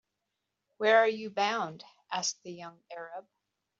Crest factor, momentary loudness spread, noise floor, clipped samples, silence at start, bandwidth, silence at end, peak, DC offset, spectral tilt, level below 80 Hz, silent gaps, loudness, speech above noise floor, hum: 22 dB; 21 LU; -85 dBFS; under 0.1%; 0.8 s; 7.6 kHz; 0.6 s; -10 dBFS; under 0.1%; -1 dB/octave; -86 dBFS; none; -29 LUFS; 54 dB; none